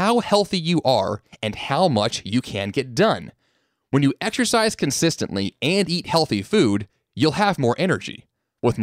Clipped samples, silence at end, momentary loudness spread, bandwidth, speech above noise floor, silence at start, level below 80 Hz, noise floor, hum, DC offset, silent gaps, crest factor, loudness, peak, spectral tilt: under 0.1%; 0 s; 7 LU; 16 kHz; 48 dB; 0 s; -54 dBFS; -68 dBFS; none; under 0.1%; none; 16 dB; -21 LUFS; -4 dBFS; -5 dB/octave